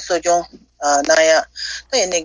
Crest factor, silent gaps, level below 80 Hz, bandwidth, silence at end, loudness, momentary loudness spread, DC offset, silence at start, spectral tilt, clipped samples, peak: 16 dB; none; -50 dBFS; 8 kHz; 0 s; -16 LUFS; 13 LU; under 0.1%; 0 s; -0.5 dB/octave; under 0.1%; -2 dBFS